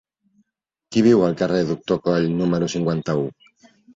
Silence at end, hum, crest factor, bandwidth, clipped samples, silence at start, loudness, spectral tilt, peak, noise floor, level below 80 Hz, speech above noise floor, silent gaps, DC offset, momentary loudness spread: 0.65 s; none; 16 dB; 7.8 kHz; under 0.1%; 0.9 s; -20 LUFS; -7 dB/octave; -4 dBFS; -74 dBFS; -54 dBFS; 54 dB; none; under 0.1%; 8 LU